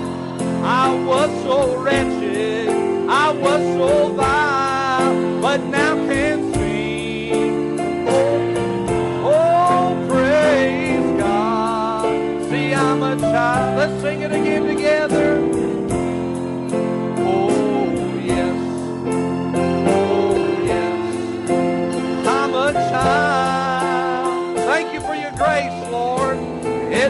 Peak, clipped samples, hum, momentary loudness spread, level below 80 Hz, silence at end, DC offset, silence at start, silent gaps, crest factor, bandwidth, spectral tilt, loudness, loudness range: -4 dBFS; under 0.1%; none; 6 LU; -44 dBFS; 0 s; under 0.1%; 0 s; none; 14 dB; 11.5 kHz; -5.5 dB/octave; -18 LUFS; 3 LU